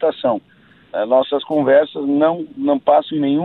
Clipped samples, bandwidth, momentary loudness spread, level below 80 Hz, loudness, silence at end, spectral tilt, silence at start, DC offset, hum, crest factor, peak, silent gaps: under 0.1%; 4.2 kHz; 8 LU; -64 dBFS; -17 LUFS; 0 s; -9 dB/octave; 0 s; under 0.1%; none; 16 dB; -2 dBFS; none